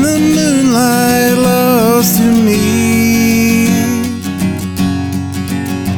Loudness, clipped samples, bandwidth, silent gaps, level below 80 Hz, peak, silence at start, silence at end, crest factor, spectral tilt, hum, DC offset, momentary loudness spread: -11 LUFS; under 0.1%; 19.5 kHz; none; -38 dBFS; 0 dBFS; 0 s; 0 s; 10 dB; -5 dB/octave; none; under 0.1%; 8 LU